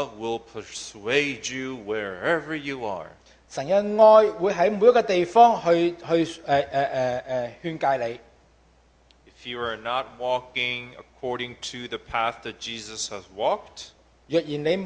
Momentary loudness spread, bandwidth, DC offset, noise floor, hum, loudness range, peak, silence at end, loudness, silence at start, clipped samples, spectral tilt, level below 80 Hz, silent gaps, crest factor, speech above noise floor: 18 LU; 9.6 kHz; under 0.1%; -59 dBFS; none; 11 LU; -4 dBFS; 0 s; -24 LUFS; 0 s; under 0.1%; -4.5 dB/octave; -60 dBFS; none; 20 dB; 35 dB